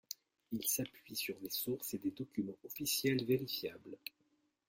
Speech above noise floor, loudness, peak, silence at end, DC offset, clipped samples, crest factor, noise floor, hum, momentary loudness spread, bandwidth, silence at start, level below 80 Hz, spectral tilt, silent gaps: 39 dB; -39 LUFS; -22 dBFS; 0.75 s; under 0.1%; under 0.1%; 18 dB; -79 dBFS; none; 15 LU; 16.5 kHz; 0.1 s; -76 dBFS; -3.5 dB/octave; none